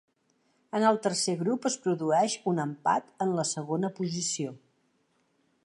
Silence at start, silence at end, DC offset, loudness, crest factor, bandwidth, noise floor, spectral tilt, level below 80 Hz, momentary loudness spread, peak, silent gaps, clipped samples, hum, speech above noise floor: 0.75 s; 1.05 s; under 0.1%; -29 LUFS; 20 dB; 11.5 kHz; -72 dBFS; -4.5 dB/octave; -80 dBFS; 6 LU; -10 dBFS; none; under 0.1%; none; 43 dB